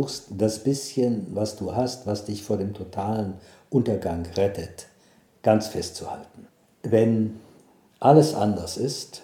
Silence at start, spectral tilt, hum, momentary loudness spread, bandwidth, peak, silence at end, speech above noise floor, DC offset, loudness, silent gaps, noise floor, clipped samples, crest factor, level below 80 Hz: 0 s; -6.5 dB/octave; none; 15 LU; 17.5 kHz; -2 dBFS; 0.05 s; 34 dB; under 0.1%; -25 LUFS; none; -58 dBFS; under 0.1%; 22 dB; -54 dBFS